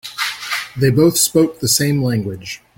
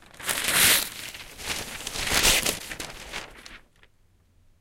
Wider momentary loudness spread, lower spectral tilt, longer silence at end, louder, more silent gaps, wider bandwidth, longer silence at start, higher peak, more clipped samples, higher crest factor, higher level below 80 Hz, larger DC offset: second, 10 LU vs 19 LU; first, -4 dB/octave vs 0 dB/octave; second, 0.2 s vs 1 s; first, -16 LUFS vs -22 LUFS; neither; about the same, 17 kHz vs 17 kHz; about the same, 0.05 s vs 0.15 s; first, -2 dBFS vs -6 dBFS; neither; second, 16 dB vs 22 dB; about the same, -48 dBFS vs -44 dBFS; neither